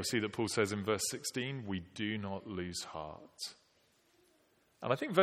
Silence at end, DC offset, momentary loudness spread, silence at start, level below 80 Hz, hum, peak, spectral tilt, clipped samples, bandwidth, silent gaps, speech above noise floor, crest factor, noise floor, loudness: 0 s; under 0.1%; 11 LU; 0 s; -70 dBFS; none; -14 dBFS; -4 dB/octave; under 0.1%; 16.5 kHz; none; 35 dB; 24 dB; -72 dBFS; -37 LUFS